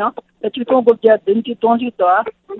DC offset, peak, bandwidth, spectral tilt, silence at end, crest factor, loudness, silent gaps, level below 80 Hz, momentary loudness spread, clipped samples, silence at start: under 0.1%; 0 dBFS; 4.1 kHz; -8.5 dB/octave; 0 s; 16 dB; -15 LUFS; none; -60 dBFS; 11 LU; under 0.1%; 0 s